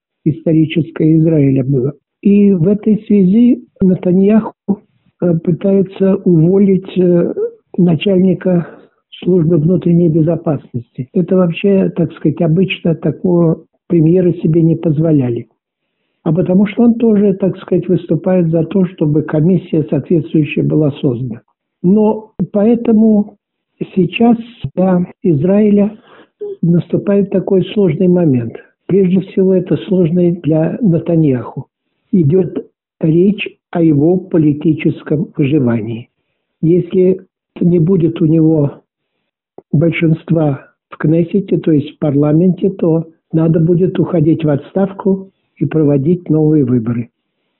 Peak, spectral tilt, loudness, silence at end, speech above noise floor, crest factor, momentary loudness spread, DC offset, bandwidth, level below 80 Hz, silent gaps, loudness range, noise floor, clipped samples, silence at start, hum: -2 dBFS; -9 dB/octave; -13 LUFS; 0.55 s; 60 dB; 10 dB; 9 LU; under 0.1%; 4 kHz; -48 dBFS; none; 2 LU; -72 dBFS; under 0.1%; 0.25 s; none